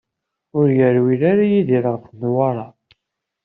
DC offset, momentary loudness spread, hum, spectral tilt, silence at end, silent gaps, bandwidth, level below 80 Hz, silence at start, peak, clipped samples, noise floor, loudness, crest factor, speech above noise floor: under 0.1%; 11 LU; none; -8.5 dB/octave; 0.75 s; none; 4.1 kHz; -60 dBFS; 0.55 s; -4 dBFS; under 0.1%; -79 dBFS; -17 LUFS; 14 dB; 63 dB